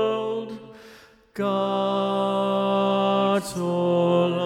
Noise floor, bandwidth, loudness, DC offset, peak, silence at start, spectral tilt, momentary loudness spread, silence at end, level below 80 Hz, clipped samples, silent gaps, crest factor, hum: -50 dBFS; 15 kHz; -23 LUFS; under 0.1%; -10 dBFS; 0 s; -6.5 dB/octave; 9 LU; 0 s; -66 dBFS; under 0.1%; none; 14 dB; none